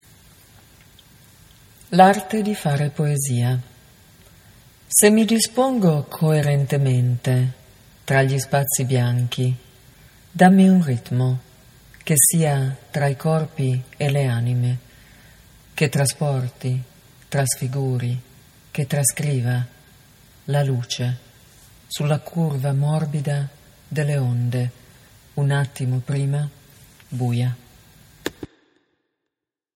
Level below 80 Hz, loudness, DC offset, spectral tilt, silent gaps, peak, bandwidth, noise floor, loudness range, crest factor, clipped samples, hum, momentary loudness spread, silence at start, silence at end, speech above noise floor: -56 dBFS; -20 LUFS; under 0.1%; -5.5 dB/octave; none; 0 dBFS; 16.5 kHz; -84 dBFS; 7 LU; 22 dB; under 0.1%; none; 16 LU; 1.9 s; 1.3 s; 65 dB